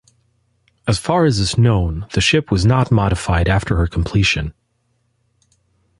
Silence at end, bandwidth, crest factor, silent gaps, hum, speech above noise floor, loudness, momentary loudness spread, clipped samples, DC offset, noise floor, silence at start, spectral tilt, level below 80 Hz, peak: 1.5 s; 11.5 kHz; 16 dB; none; none; 50 dB; -17 LUFS; 6 LU; under 0.1%; under 0.1%; -65 dBFS; 0.85 s; -5.5 dB/octave; -28 dBFS; -2 dBFS